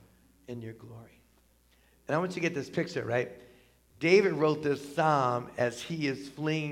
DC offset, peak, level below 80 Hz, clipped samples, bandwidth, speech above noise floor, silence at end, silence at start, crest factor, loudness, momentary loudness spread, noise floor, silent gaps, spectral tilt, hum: under 0.1%; -10 dBFS; -68 dBFS; under 0.1%; 14.5 kHz; 35 dB; 0 s; 0.5 s; 20 dB; -30 LUFS; 19 LU; -65 dBFS; none; -6 dB/octave; none